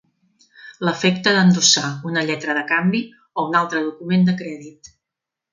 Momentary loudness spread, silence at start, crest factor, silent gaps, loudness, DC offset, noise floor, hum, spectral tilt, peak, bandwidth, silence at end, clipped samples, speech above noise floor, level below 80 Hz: 12 LU; 0.65 s; 20 dB; none; -18 LUFS; under 0.1%; -85 dBFS; none; -4 dB/octave; 0 dBFS; 9.4 kHz; 0.85 s; under 0.1%; 66 dB; -64 dBFS